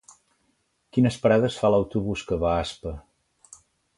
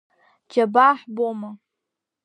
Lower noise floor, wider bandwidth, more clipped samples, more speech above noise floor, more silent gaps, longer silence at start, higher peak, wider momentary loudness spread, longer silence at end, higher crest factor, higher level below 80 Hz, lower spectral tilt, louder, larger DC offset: second, -71 dBFS vs -84 dBFS; first, 11.5 kHz vs 10 kHz; neither; second, 48 dB vs 64 dB; neither; first, 0.95 s vs 0.55 s; second, -6 dBFS vs -2 dBFS; about the same, 14 LU vs 16 LU; first, 0.95 s vs 0.7 s; about the same, 20 dB vs 20 dB; first, -44 dBFS vs -84 dBFS; about the same, -6.5 dB/octave vs -6 dB/octave; second, -24 LUFS vs -20 LUFS; neither